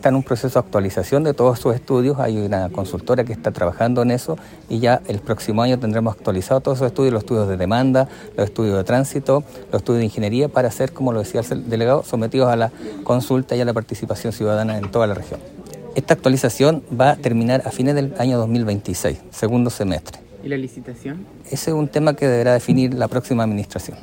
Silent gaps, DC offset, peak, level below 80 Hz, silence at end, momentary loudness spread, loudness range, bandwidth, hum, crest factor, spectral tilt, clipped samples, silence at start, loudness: none; under 0.1%; 0 dBFS; -48 dBFS; 0 s; 10 LU; 3 LU; 16.5 kHz; none; 18 dB; -6.5 dB/octave; under 0.1%; 0 s; -19 LUFS